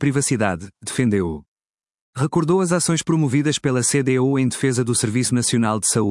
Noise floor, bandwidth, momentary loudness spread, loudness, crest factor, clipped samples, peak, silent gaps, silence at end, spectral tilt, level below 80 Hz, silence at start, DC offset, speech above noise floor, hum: under -90 dBFS; 12 kHz; 7 LU; -19 LUFS; 16 dB; under 0.1%; -4 dBFS; 1.48-1.56 s, 1.69-1.74 s, 2.01-2.13 s; 0 s; -5 dB/octave; -54 dBFS; 0 s; under 0.1%; over 71 dB; none